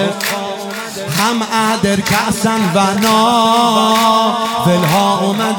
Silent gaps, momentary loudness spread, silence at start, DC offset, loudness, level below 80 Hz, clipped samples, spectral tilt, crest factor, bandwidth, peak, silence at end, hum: none; 8 LU; 0 s; under 0.1%; -13 LUFS; -48 dBFS; under 0.1%; -4 dB/octave; 12 dB; 19.5 kHz; -2 dBFS; 0 s; none